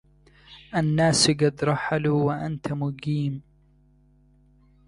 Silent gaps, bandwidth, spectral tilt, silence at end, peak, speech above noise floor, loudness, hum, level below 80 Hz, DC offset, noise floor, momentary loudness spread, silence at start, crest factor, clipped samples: none; 11.5 kHz; -5 dB/octave; 1.45 s; -6 dBFS; 35 dB; -24 LUFS; 50 Hz at -40 dBFS; -54 dBFS; under 0.1%; -59 dBFS; 11 LU; 0.5 s; 18 dB; under 0.1%